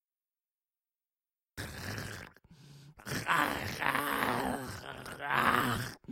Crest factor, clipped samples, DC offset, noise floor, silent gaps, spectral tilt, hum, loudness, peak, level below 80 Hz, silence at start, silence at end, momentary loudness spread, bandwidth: 24 dB; under 0.1%; under 0.1%; under -90 dBFS; none; -4 dB/octave; none; -33 LUFS; -12 dBFS; -60 dBFS; 1.55 s; 0 s; 16 LU; 16.5 kHz